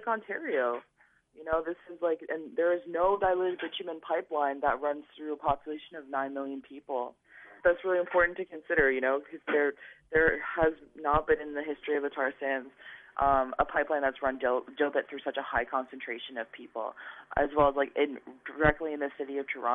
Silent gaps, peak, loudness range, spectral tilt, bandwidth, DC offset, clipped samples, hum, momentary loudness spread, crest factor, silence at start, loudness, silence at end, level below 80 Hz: none; -10 dBFS; 5 LU; -8 dB/octave; 3.9 kHz; under 0.1%; under 0.1%; none; 13 LU; 22 dB; 0 s; -30 LUFS; 0 s; -52 dBFS